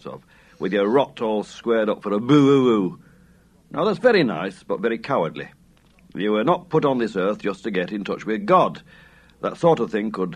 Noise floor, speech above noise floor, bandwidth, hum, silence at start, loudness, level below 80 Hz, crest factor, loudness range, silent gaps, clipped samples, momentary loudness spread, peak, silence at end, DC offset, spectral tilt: -54 dBFS; 33 dB; 10 kHz; none; 0.05 s; -21 LUFS; -60 dBFS; 18 dB; 4 LU; none; under 0.1%; 12 LU; -4 dBFS; 0 s; under 0.1%; -7 dB/octave